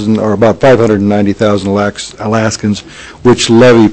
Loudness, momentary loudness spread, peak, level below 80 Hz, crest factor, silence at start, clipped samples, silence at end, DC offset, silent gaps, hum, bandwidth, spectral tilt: -10 LUFS; 11 LU; 0 dBFS; -40 dBFS; 8 dB; 0 s; 0.4%; 0 s; under 0.1%; none; none; 8.6 kHz; -5.5 dB/octave